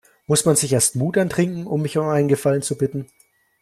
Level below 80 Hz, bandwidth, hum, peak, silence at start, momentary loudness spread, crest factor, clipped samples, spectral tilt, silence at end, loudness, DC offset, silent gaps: -56 dBFS; 15 kHz; none; -4 dBFS; 0.3 s; 8 LU; 16 dB; under 0.1%; -5 dB/octave; 0.55 s; -20 LUFS; under 0.1%; none